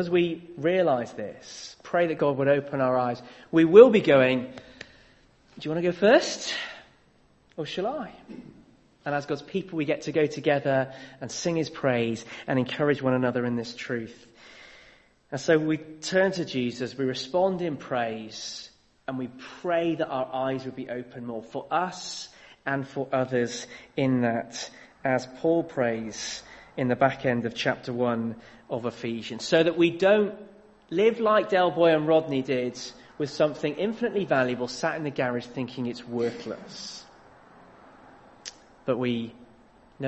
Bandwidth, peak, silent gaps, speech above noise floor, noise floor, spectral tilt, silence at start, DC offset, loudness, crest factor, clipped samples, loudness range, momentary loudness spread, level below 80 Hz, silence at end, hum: 8.4 kHz; -2 dBFS; none; 36 dB; -61 dBFS; -5.5 dB/octave; 0 s; under 0.1%; -26 LUFS; 24 dB; under 0.1%; 10 LU; 16 LU; -64 dBFS; 0 s; none